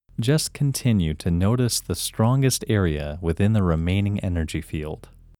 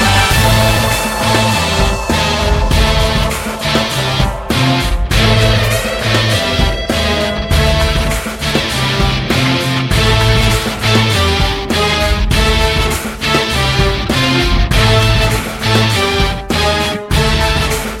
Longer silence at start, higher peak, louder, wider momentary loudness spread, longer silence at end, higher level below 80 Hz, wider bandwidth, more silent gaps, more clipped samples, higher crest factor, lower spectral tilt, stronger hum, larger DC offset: first, 0.2 s vs 0 s; second, -6 dBFS vs 0 dBFS; second, -23 LUFS vs -13 LUFS; first, 8 LU vs 5 LU; first, 0.45 s vs 0 s; second, -38 dBFS vs -20 dBFS; first, 18.5 kHz vs 16.5 kHz; neither; neither; about the same, 16 dB vs 12 dB; about the same, -5.5 dB/octave vs -4.5 dB/octave; neither; neither